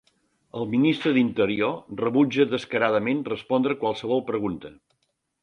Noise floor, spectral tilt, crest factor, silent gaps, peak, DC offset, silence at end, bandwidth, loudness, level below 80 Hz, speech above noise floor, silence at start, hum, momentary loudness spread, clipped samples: -74 dBFS; -7 dB/octave; 18 dB; none; -6 dBFS; under 0.1%; 0.75 s; 8.8 kHz; -24 LUFS; -62 dBFS; 51 dB; 0.55 s; none; 7 LU; under 0.1%